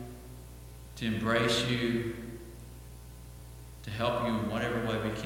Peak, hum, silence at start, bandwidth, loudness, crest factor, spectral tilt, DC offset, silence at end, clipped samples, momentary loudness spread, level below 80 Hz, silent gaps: -14 dBFS; none; 0 s; 17 kHz; -31 LUFS; 20 dB; -5 dB/octave; under 0.1%; 0 s; under 0.1%; 21 LU; -50 dBFS; none